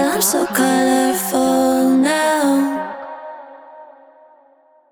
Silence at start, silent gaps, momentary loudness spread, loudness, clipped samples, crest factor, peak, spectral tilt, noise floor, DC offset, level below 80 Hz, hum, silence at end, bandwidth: 0 s; none; 17 LU; -16 LUFS; under 0.1%; 14 dB; -2 dBFS; -3 dB/octave; -53 dBFS; under 0.1%; -60 dBFS; none; 1.05 s; over 20 kHz